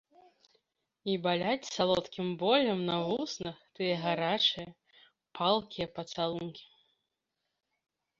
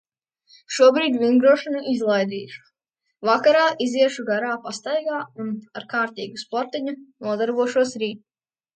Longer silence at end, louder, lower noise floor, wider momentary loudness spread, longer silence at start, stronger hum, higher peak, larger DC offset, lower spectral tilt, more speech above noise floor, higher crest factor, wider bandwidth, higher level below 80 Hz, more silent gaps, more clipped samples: first, 1.55 s vs 0.6 s; second, -31 LUFS vs -21 LUFS; first, -85 dBFS vs -78 dBFS; about the same, 14 LU vs 14 LU; first, 1.05 s vs 0.7 s; neither; second, -12 dBFS vs -4 dBFS; neither; about the same, -5 dB/octave vs -4 dB/octave; second, 53 dB vs 57 dB; about the same, 22 dB vs 18 dB; second, 7.8 kHz vs 9.2 kHz; first, -70 dBFS vs -76 dBFS; neither; neither